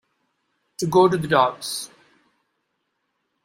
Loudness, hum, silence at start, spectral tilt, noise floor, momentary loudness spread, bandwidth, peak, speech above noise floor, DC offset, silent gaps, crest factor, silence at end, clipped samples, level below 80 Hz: -20 LUFS; none; 0.8 s; -5 dB/octave; -75 dBFS; 18 LU; 16 kHz; -4 dBFS; 55 dB; under 0.1%; none; 20 dB; 1.6 s; under 0.1%; -62 dBFS